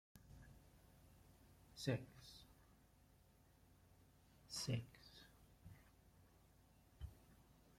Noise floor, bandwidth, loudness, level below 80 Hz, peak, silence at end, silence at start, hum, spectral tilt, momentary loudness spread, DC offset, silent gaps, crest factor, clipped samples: -72 dBFS; 16.5 kHz; -49 LUFS; -70 dBFS; -28 dBFS; 0 s; 0.15 s; none; -5 dB/octave; 24 LU; under 0.1%; none; 28 dB; under 0.1%